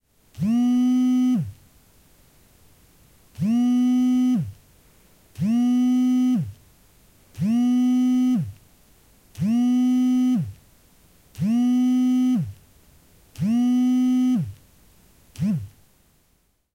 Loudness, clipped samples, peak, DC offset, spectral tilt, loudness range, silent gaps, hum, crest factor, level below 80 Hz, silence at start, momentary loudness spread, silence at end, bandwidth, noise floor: -21 LUFS; under 0.1%; -14 dBFS; under 0.1%; -7 dB/octave; 3 LU; none; none; 8 dB; -60 dBFS; 0.35 s; 9 LU; 1.05 s; 11 kHz; -65 dBFS